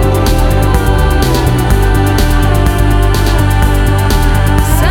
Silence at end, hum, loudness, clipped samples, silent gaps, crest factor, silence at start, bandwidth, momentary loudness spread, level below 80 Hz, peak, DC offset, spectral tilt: 0 s; none; -11 LUFS; under 0.1%; none; 8 dB; 0 s; 18.5 kHz; 1 LU; -12 dBFS; 0 dBFS; under 0.1%; -6 dB/octave